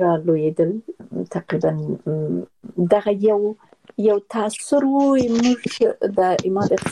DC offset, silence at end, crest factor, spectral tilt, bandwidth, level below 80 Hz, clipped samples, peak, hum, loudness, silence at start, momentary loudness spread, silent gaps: under 0.1%; 0 s; 16 dB; -6.5 dB/octave; 12 kHz; -58 dBFS; under 0.1%; -2 dBFS; none; -20 LUFS; 0 s; 11 LU; none